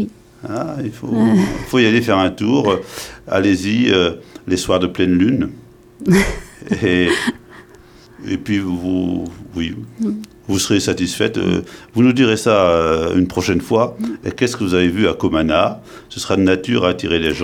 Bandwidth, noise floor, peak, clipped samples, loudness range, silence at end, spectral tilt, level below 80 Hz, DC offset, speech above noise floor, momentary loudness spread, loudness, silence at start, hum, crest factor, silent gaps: 17 kHz; -43 dBFS; 0 dBFS; under 0.1%; 5 LU; 0 s; -5.5 dB/octave; -40 dBFS; under 0.1%; 27 dB; 12 LU; -17 LUFS; 0 s; none; 16 dB; none